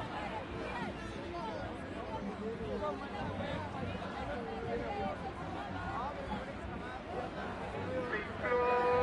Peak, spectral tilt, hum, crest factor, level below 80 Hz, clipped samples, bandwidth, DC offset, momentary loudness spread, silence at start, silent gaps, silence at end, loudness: -20 dBFS; -6.5 dB/octave; none; 18 dB; -54 dBFS; under 0.1%; 11 kHz; under 0.1%; 7 LU; 0 s; none; 0 s; -39 LUFS